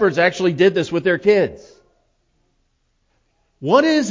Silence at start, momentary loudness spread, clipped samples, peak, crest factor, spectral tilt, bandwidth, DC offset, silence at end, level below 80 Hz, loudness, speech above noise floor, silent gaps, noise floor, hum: 0 s; 5 LU; under 0.1%; 0 dBFS; 18 dB; -5.5 dB/octave; 7.6 kHz; under 0.1%; 0 s; -56 dBFS; -17 LUFS; 50 dB; none; -66 dBFS; none